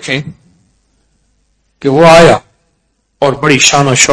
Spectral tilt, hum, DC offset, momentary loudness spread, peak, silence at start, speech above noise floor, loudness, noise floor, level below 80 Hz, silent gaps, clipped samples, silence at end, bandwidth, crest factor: -3.5 dB/octave; none; under 0.1%; 14 LU; 0 dBFS; 0 s; 53 dB; -7 LUFS; -60 dBFS; -38 dBFS; none; 5%; 0 s; 11 kHz; 10 dB